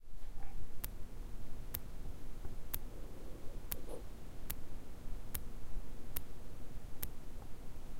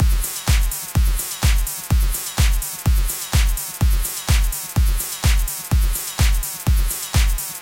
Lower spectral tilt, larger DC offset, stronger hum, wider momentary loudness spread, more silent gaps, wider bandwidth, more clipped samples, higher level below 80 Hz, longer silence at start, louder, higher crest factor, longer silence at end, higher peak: about the same, -4.5 dB/octave vs -3.5 dB/octave; neither; neither; first, 9 LU vs 2 LU; neither; about the same, 16 kHz vs 17 kHz; neither; second, -46 dBFS vs -20 dBFS; about the same, 0 s vs 0 s; second, -49 LUFS vs -21 LUFS; first, 20 dB vs 12 dB; about the same, 0 s vs 0 s; second, -16 dBFS vs -6 dBFS